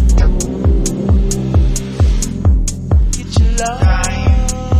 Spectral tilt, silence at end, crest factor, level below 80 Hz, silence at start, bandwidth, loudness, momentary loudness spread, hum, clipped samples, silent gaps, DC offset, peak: -5.5 dB/octave; 0 s; 10 dB; -14 dBFS; 0 s; 14.5 kHz; -15 LUFS; 2 LU; none; under 0.1%; none; under 0.1%; -2 dBFS